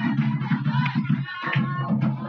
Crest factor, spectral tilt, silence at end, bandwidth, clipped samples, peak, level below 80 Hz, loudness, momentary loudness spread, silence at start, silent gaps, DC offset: 14 dB; -9 dB/octave; 0 s; 5.8 kHz; under 0.1%; -10 dBFS; -68 dBFS; -24 LUFS; 2 LU; 0 s; none; under 0.1%